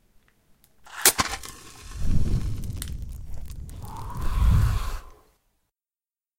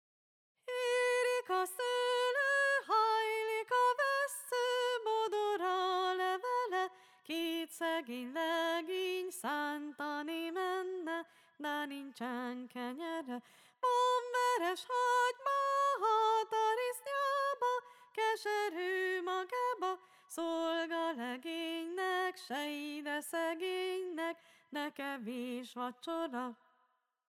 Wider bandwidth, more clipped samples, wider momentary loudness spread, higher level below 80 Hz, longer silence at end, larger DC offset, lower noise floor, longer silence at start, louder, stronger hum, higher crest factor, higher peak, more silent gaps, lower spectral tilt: about the same, 17 kHz vs 18 kHz; neither; first, 21 LU vs 11 LU; first, -30 dBFS vs under -90 dBFS; first, 1.25 s vs 0.75 s; neither; first, under -90 dBFS vs -78 dBFS; first, 0.85 s vs 0.65 s; first, -26 LUFS vs -36 LUFS; neither; first, 26 dB vs 14 dB; first, 0 dBFS vs -22 dBFS; neither; first, -3 dB/octave vs -1.5 dB/octave